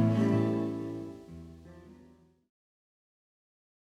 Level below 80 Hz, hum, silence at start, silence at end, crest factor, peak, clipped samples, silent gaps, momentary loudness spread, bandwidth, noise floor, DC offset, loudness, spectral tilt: -64 dBFS; none; 0 s; 2.05 s; 20 dB; -14 dBFS; under 0.1%; none; 25 LU; 9.6 kHz; -60 dBFS; under 0.1%; -31 LUFS; -9 dB/octave